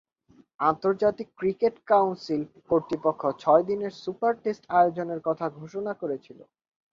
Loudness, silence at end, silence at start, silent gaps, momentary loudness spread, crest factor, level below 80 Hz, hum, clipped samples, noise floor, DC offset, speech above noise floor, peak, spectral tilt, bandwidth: -26 LUFS; 0.5 s; 0.6 s; none; 11 LU; 20 dB; -66 dBFS; none; under 0.1%; -60 dBFS; under 0.1%; 34 dB; -6 dBFS; -7.5 dB/octave; 7.4 kHz